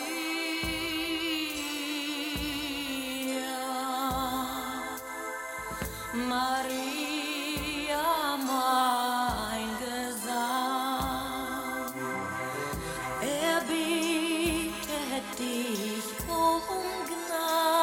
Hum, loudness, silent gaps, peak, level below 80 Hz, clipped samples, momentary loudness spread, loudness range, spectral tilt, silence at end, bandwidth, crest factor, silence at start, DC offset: none; -31 LUFS; none; -12 dBFS; -52 dBFS; under 0.1%; 7 LU; 4 LU; -3 dB/octave; 0 s; 17 kHz; 18 dB; 0 s; under 0.1%